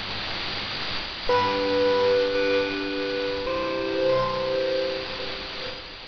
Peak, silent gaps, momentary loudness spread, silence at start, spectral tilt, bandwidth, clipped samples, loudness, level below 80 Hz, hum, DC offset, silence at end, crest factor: -12 dBFS; none; 9 LU; 0 s; -5 dB/octave; 6.6 kHz; under 0.1%; -25 LUFS; -48 dBFS; none; under 0.1%; 0 s; 14 dB